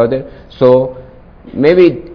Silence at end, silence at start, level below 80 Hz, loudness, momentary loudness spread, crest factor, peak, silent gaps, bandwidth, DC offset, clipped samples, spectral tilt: 0 s; 0 s; -40 dBFS; -11 LUFS; 17 LU; 12 dB; 0 dBFS; none; 5.4 kHz; under 0.1%; 1%; -9.5 dB/octave